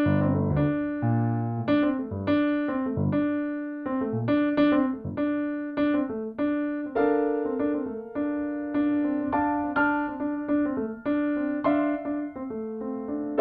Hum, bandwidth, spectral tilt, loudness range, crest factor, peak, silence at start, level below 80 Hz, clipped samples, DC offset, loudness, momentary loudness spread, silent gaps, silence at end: none; 4.9 kHz; -11 dB/octave; 2 LU; 14 dB; -12 dBFS; 0 s; -54 dBFS; under 0.1%; under 0.1%; -27 LUFS; 7 LU; none; 0 s